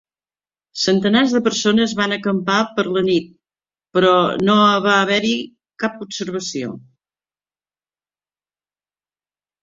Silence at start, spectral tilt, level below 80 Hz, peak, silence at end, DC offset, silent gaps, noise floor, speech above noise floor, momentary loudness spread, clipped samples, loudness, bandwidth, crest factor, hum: 0.75 s; -4.5 dB/octave; -60 dBFS; -2 dBFS; 2.85 s; under 0.1%; none; under -90 dBFS; over 73 dB; 12 LU; under 0.1%; -17 LUFS; 7.8 kHz; 18 dB; 50 Hz at -40 dBFS